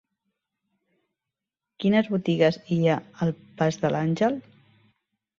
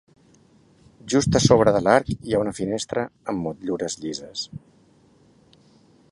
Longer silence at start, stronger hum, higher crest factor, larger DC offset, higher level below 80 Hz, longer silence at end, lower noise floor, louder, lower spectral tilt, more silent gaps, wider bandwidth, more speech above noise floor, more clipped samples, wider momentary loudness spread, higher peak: first, 1.8 s vs 1.05 s; neither; about the same, 20 dB vs 24 dB; neither; second, -64 dBFS vs -48 dBFS; second, 1 s vs 1.55 s; first, -88 dBFS vs -57 dBFS; second, -25 LUFS vs -22 LUFS; first, -7 dB/octave vs -5 dB/octave; neither; second, 7.4 kHz vs 11.5 kHz; first, 64 dB vs 35 dB; neither; second, 7 LU vs 15 LU; second, -6 dBFS vs 0 dBFS